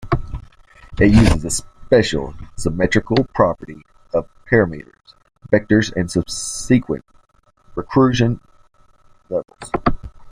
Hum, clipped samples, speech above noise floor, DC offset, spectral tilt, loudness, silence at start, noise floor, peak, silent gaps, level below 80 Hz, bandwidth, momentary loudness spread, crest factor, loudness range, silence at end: none; under 0.1%; 34 dB; under 0.1%; -5.5 dB/octave; -18 LUFS; 0 s; -51 dBFS; -2 dBFS; none; -32 dBFS; 15.5 kHz; 16 LU; 18 dB; 4 LU; 0 s